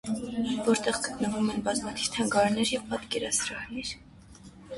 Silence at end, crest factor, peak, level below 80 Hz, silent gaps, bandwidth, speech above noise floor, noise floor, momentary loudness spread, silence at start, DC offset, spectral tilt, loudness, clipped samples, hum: 0 s; 18 dB; -12 dBFS; -56 dBFS; none; 11.5 kHz; 22 dB; -50 dBFS; 10 LU; 0.05 s; under 0.1%; -3 dB/octave; -29 LUFS; under 0.1%; none